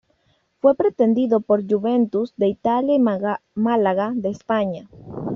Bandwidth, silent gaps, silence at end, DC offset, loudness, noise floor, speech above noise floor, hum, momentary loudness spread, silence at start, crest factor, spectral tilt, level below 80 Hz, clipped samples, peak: 6.8 kHz; none; 0 s; under 0.1%; -20 LUFS; -65 dBFS; 45 dB; none; 8 LU; 0.65 s; 16 dB; -6.5 dB/octave; -60 dBFS; under 0.1%; -4 dBFS